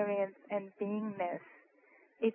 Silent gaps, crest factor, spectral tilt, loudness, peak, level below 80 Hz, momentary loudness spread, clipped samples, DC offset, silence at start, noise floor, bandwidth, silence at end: none; 18 dB; -3 dB/octave; -38 LUFS; -20 dBFS; under -90 dBFS; 7 LU; under 0.1%; under 0.1%; 0 s; -66 dBFS; 3.5 kHz; 0 s